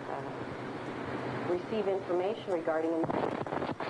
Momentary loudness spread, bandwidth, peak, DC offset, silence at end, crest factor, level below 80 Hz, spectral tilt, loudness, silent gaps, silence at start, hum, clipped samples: 8 LU; 10.5 kHz; -18 dBFS; under 0.1%; 0 s; 16 dB; -66 dBFS; -7 dB/octave; -34 LUFS; none; 0 s; none; under 0.1%